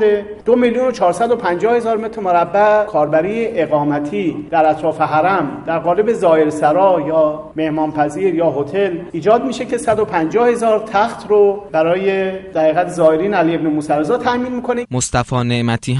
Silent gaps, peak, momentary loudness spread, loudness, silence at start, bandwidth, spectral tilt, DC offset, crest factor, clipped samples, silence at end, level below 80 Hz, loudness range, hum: none; -2 dBFS; 6 LU; -15 LUFS; 0 s; 11.5 kHz; -6 dB/octave; under 0.1%; 14 dB; under 0.1%; 0 s; -46 dBFS; 1 LU; none